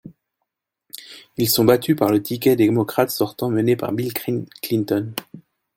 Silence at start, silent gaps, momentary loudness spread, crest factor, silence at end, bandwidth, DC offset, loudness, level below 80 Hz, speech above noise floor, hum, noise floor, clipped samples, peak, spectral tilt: 0.05 s; none; 17 LU; 20 dB; 0.35 s; 17 kHz; under 0.1%; -20 LUFS; -60 dBFS; 60 dB; none; -79 dBFS; under 0.1%; -2 dBFS; -5.5 dB/octave